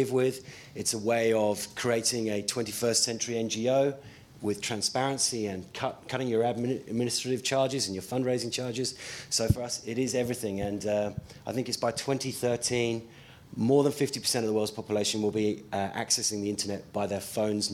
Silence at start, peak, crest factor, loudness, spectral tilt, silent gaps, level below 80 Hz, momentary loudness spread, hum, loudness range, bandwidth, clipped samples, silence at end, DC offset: 0 s; -10 dBFS; 20 dB; -29 LUFS; -3.5 dB/octave; none; -56 dBFS; 8 LU; none; 3 LU; 16.5 kHz; under 0.1%; 0 s; under 0.1%